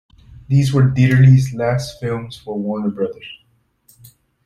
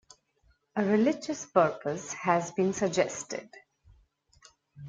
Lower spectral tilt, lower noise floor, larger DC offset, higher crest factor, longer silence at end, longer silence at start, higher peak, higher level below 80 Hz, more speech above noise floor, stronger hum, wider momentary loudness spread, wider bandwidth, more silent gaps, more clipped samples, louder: first, -7.5 dB/octave vs -5 dB/octave; second, -56 dBFS vs -69 dBFS; neither; second, 14 dB vs 22 dB; first, 1.1 s vs 0 s; second, 0.5 s vs 0.75 s; first, -2 dBFS vs -8 dBFS; first, -46 dBFS vs -68 dBFS; about the same, 40 dB vs 40 dB; neither; first, 15 LU vs 11 LU; first, 12 kHz vs 9.4 kHz; neither; neither; first, -16 LUFS vs -29 LUFS